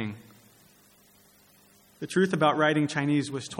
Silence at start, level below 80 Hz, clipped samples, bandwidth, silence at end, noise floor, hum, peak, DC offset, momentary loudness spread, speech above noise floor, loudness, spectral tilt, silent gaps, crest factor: 0 s; -72 dBFS; under 0.1%; 16.5 kHz; 0 s; -59 dBFS; 50 Hz at -55 dBFS; -8 dBFS; under 0.1%; 16 LU; 34 dB; -26 LUFS; -5.5 dB/octave; none; 20 dB